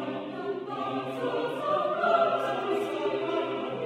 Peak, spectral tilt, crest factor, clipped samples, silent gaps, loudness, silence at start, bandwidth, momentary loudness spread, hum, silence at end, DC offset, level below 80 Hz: -12 dBFS; -6 dB/octave; 18 dB; under 0.1%; none; -29 LUFS; 0 s; 15 kHz; 10 LU; none; 0 s; under 0.1%; -76 dBFS